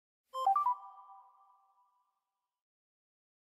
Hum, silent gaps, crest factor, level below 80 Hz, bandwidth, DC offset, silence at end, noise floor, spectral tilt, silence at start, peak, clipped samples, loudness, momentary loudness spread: none; none; 20 dB; -90 dBFS; 14.5 kHz; under 0.1%; 2.4 s; -89 dBFS; -1 dB/octave; 0.35 s; -20 dBFS; under 0.1%; -34 LUFS; 23 LU